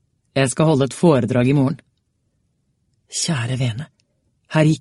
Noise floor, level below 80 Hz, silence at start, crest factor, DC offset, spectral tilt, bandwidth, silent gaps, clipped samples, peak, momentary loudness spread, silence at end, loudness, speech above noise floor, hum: -68 dBFS; -54 dBFS; 0.35 s; 18 dB; under 0.1%; -6 dB/octave; 11.5 kHz; none; under 0.1%; -2 dBFS; 12 LU; 0 s; -19 LUFS; 51 dB; none